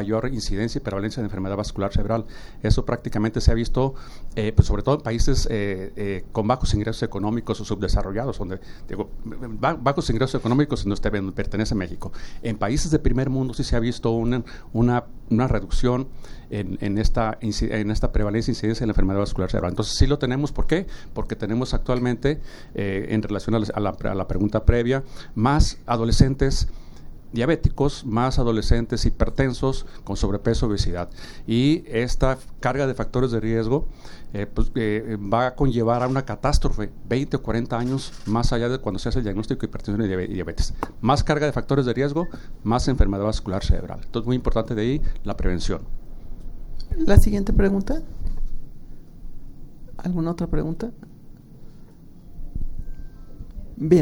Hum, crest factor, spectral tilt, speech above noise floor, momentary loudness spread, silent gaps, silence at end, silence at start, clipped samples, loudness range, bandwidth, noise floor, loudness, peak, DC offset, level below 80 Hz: none; 22 dB; -6.5 dB/octave; 21 dB; 12 LU; none; 0 s; 0 s; under 0.1%; 4 LU; 12 kHz; -42 dBFS; -24 LUFS; 0 dBFS; under 0.1%; -28 dBFS